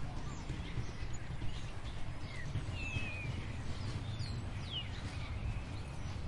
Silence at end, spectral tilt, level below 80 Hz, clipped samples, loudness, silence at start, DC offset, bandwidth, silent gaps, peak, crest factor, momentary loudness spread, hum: 0 s; -5.5 dB/octave; -46 dBFS; under 0.1%; -43 LUFS; 0 s; under 0.1%; 11.5 kHz; none; -24 dBFS; 16 dB; 5 LU; none